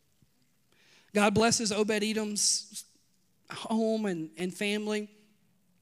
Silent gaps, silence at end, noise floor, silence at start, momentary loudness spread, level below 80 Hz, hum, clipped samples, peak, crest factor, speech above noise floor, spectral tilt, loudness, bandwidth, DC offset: none; 0.75 s; -71 dBFS; 1.15 s; 17 LU; -68 dBFS; none; under 0.1%; -10 dBFS; 22 dB; 42 dB; -3 dB/octave; -29 LUFS; 16 kHz; under 0.1%